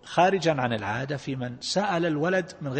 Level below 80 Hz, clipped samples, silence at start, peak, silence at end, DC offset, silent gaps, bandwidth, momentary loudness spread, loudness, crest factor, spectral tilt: -62 dBFS; under 0.1%; 0.05 s; -8 dBFS; 0 s; under 0.1%; none; 8.8 kHz; 9 LU; -26 LUFS; 18 dB; -5 dB/octave